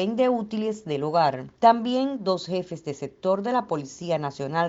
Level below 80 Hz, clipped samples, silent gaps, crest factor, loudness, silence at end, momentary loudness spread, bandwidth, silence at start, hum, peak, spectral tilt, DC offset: -66 dBFS; under 0.1%; none; 20 dB; -25 LUFS; 0 s; 11 LU; 8 kHz; 0 s; none; -4 dBFS; -6 dB/octave; under 0.1%